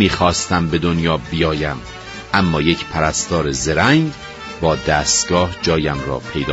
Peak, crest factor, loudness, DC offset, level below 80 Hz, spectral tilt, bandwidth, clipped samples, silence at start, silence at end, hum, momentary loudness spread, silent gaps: 0 dBFS; 18 dB; -17 LUFS; under 0.1%; -34 dBFS; -4 dB/octave; 8.2 kHz; under 0.1%; 0 s; 0 s; none; 9 LU; none